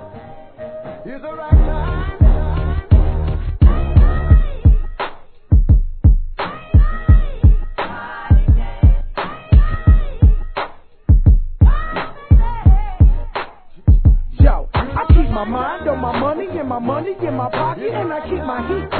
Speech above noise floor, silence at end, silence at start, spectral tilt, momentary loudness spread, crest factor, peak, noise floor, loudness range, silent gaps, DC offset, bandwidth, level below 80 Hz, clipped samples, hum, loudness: 18 dB; 0 s; 0 s; -11.5 dB/octave; 13 LU; 14 dB; 0 dBFS; -36 dBFS; 3 LU; none; 0.4%; 4.5 kHz; -16 dBFS; under 0.1%; none; -17 LUFS